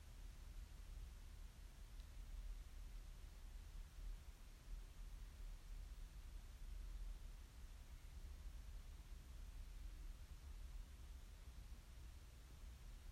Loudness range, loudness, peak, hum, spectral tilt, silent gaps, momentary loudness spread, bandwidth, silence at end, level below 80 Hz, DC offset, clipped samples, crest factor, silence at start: 1 LU; -60 LUFS; -42 dBFS; none; -4.5 dB/octave; none; 3 LU; 16 kHz; 0 s; -56 dBFS; under 0.1%; under 0.1%; 12 dB; 0 s